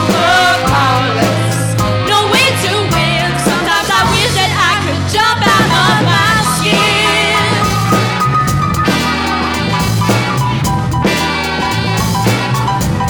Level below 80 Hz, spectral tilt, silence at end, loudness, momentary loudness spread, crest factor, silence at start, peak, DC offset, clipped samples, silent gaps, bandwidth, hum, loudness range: -32 dBFS; -4 dB/octave; 0 s; -11 LUFS; 5 LU; 10 dB; 0 s; -2 dBFS; under 0.1%; under 0.1%; none; over 20 kHz; none; 3 LU